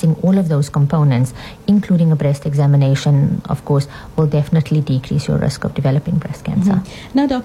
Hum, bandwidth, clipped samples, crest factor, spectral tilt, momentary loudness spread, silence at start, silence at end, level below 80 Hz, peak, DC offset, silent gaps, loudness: none; 12 kHz; under 0.1%; 12 dB; -8 dB/octave; 7 LU; 0 s; 0 s; -40 dBFS; -4 dBFS; under 0.1%; none; -16 LUFS